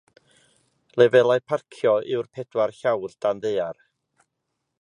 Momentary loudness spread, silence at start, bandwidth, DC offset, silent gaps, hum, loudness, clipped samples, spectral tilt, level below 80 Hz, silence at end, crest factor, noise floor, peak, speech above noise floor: 12 LU; 0.95 s; 10.5 kHz; under 0.1%; none; none; -23 LUFS; under 0.1%; -6 dB/octave; -70 dBFS; 1.1 s; 20 dB; -79 dBFS; -4 dBFS; 57 dB